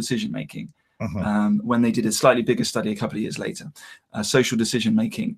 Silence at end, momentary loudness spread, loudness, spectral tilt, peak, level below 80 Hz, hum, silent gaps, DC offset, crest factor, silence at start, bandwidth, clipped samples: 0 s; 17 LU; -22 LUFS; -4.5 dB/octave; -2 dBFS; -56 dBFS; none; none; under 0.1%; 20 dB; 0 s; 15 kHz; under 0.1%